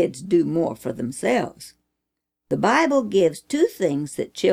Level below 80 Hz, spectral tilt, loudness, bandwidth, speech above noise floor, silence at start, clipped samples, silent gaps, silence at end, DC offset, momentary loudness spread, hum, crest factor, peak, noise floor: -62 dBFS; -5.5 dB/octave; -22 LUFS; 16 kHz; 61 dB; 0 s; under 0.1%; none; 0 s; under 0.1%; 10 LU; none; 16 dB; -6 dBFS; -82 dBFS